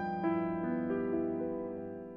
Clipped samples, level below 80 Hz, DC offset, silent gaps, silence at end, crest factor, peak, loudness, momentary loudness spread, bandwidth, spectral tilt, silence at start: under 0.1%; -68 dBFS; under 0.1%; none; 0 s; 14 dB; -22 dBFS; -35 LUFS; 7 LU; 5.2 kHz; -10.5 dB/octave; 0 s